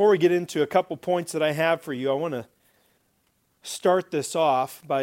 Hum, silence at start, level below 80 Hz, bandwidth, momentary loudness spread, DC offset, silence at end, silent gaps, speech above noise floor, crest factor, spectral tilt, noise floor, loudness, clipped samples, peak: none; 0 s; -74 dBFS; 16.5 kHz; 7 LU; under 0.1%; 0 s; none; 46 dB; 18 dB; -5 dB/octave; -69 dBFS; -24 LUFS; under 0.1%; -6 dBFS